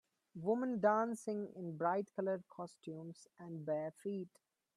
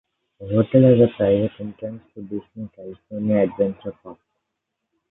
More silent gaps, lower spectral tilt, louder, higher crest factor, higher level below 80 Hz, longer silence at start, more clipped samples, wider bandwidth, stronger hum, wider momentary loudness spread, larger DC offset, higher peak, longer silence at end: neither; second, -7 dB/octave vs -13 dB/octave; second, -40 LUFS vs -19 LUFS; about the same, 20 dB vs 20 dB; second, -88 dBFS vs -54 dBFS; about the same, 0.35 s vs 0.4 s; neither; first, 12.5 kHz vs 4 kHz; neither; second, 17 LU vs 21 LU; neither; second, -20 dBFS vs -2 dBFS; second, 0.5 s vs 0.95 s